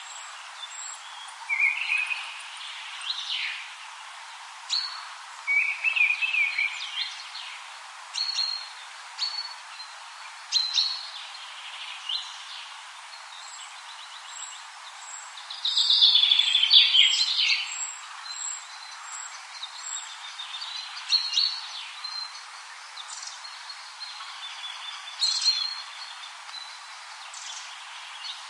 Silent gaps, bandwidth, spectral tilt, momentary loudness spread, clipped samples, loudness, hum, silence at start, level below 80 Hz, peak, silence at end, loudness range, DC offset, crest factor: none; 11.5 kHz; 11.5 dB/octave; 20 LU; under 0.1%; -24 LUFS; none; 0 s; under -90 dBFS; -4 dBFS; 0 s; 16 LU; under 0.1%; 26 dB